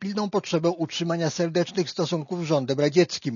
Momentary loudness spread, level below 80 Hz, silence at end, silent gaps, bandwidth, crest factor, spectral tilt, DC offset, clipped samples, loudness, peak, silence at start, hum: 6 LU; -68 dBFS; 0 s; none; 7.4 kHz; 18 dB; -5.5 dB/octave; under 0.1%; under 0.1%; -25 LUFS; -6 dBFS; 0 s; none